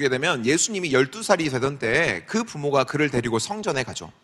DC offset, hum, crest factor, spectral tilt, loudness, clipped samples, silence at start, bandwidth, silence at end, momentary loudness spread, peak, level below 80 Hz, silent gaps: under 0.1%; none; 22 dB; -4 dB/octave; -23 LUFS; under 0.1%; 0 s; 13 kHz; 0.15 s; 5 LU; -2 dBFS; -54 dBFS; none